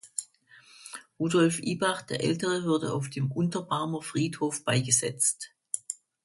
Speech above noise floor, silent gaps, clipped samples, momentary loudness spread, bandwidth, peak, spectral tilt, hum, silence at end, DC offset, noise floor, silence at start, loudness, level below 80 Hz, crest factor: 29 dB; none; under 0.1%; 13 LU; 12 kHz; -10 dBFS; -4 dB/octave; none; 0.3 s; under 0.1%; -57 dBFS; 0.05 s; -28 LUFS; -66 dBFS; 20 dB